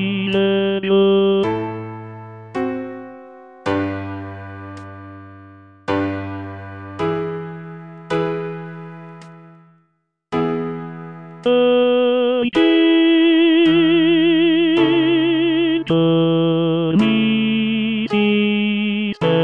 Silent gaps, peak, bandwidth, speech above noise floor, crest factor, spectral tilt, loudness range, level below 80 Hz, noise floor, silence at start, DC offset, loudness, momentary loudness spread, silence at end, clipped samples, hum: none; -4 dBFS; 5.6 kHz; 51 dB; 14 dB; -8 dB/octave; 13 LU; -58 dBFS; -67 dBFS; 0 s; under 0.1%; -17 LUFS; 20 LU; 0 s; under 0.1%; none